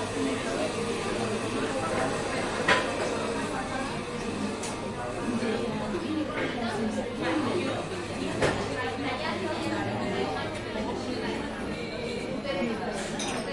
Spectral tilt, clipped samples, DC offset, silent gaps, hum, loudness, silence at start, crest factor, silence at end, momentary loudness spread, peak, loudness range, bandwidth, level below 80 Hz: -4.5 dB/octave; under 0.1%; under 0.1%; none; none; -30 LUFS; 0 s; 22 dB; 0 s; 5 LU; -8 dBFS; 3 LU; 11.5 kHz; -50 dBFS